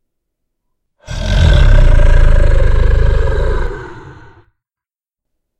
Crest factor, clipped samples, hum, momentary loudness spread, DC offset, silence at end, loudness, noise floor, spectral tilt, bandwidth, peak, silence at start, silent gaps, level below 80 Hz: 10 dB; 0.3%; none; 17 LU; under 0.1%; 1.5 s; -13 LUFS; -89 dBFS; -6.5 dB/octave; 8.2 kHz; 0 dBFS; 1.1 s; none; -12 dBFS